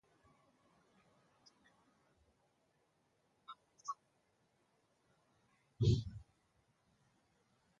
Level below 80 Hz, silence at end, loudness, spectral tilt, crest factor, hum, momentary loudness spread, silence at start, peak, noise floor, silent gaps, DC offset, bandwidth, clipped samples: -60 dBFS; 1.6 s; -39 LUFS; -7.5 dB/octave; 26 dB; none; 23 LU; 3.5 s; -20 dBFS; -79 dBFS; none; under 0.1%; 7.8 kHz; under 0.1%